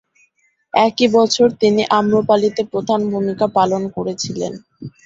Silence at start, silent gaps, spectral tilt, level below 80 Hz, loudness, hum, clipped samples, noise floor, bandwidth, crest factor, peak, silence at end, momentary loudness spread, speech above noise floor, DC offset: 0.75 s; none; -5 dB/octave; -56 dBFS; -16 LUFS; none; under 0.1%; -61 dBFS; 7.8 kHz; 16 dB; -2 dBFS; 0.15 s; 10 LU; 45 dB; under 0.1%